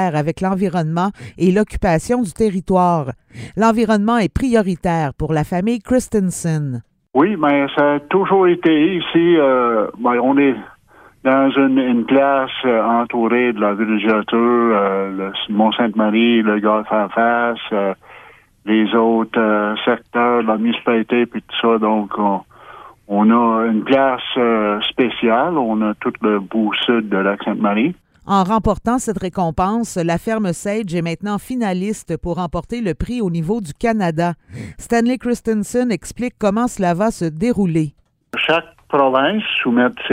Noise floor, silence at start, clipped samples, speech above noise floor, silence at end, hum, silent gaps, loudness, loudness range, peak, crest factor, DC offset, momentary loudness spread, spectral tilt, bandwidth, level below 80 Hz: -48 dBFS; 0 s; under 0.1%; 31 dB; 0 s; none; none; -17 LUFS; 4 LU; 0 dBFS; 16 dB; under 0.1%; 8 LU; -6 dB/octave; 15 kHz; -40 dBFS